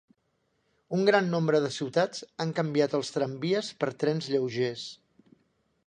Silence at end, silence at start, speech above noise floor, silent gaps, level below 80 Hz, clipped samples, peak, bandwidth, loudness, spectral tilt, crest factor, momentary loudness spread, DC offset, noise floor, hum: 0.9 s; 0.9 s; 47 dB; none; -74 dBFS; under 0.1%; -8 dBFS; 10 kHz; -28 LUFS; -5.5 dB/octave; 22 dB; 9 LU; under 0.1%; -74 dBFS; none